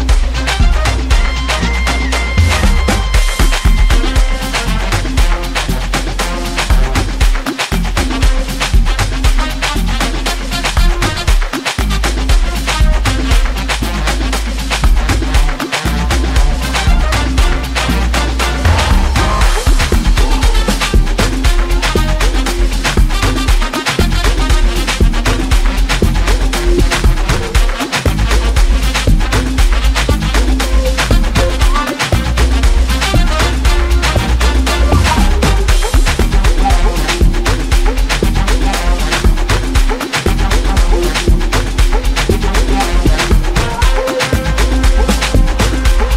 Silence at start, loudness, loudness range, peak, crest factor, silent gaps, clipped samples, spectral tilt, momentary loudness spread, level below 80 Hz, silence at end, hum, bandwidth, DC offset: 0 s; -14 LUFS; 2 LU; 0 dBFS; 10 dB; none; under 0.1%; -4.5 dB/octave; 3 LU; -12 dBFS; 0 s; none; 15.5 kHz; under 0.1%